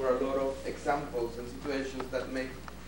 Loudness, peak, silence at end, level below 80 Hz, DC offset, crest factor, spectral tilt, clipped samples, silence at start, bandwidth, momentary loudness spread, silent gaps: -34 LUFS; -16 dBFS; 0 s; -50 dBFS; 0.3%; 18 dB; -5.5 dB/octave; under 0.1%; 0 s; 16.5 kHz; 7 LU; none